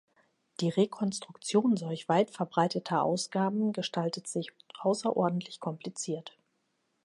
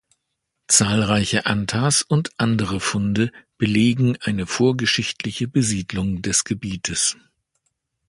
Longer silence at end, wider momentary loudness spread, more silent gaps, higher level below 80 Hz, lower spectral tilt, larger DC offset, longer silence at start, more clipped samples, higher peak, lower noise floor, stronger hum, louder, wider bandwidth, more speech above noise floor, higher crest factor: second, 0.75 s vs 0.95 s; about the same, 10 LU vs 8 LU; neither; second, -80 dBFS vs -46 dBFS; first, -5.5 dB/octave vs -4 dB/octave; neither; about the same, 0.6 s vs 0.7 s; neither; second, -12 dBFS vs -2 dBFS; about the same, -77 dBFS vs -77 dBFS; neither; second, -31 LUFS vs -20 LUFS; about the same, 11.5 kHz vs 11.5 kHz; second, 47 dB vs 57 dB; about the same, 18 dB vs 20 dB